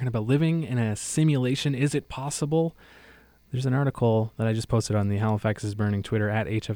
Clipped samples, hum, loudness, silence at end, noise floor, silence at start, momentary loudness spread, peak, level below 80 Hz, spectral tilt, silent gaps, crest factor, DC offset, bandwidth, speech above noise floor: under 0.1%; none; -26 LUFS; 0 s; -54 dBFS; 0 s; 5 LU; -10 dBFS; -52 dBFS; -6 dB/octave; none; 14 dB; under 0.1%; 19 kHz; 29 dB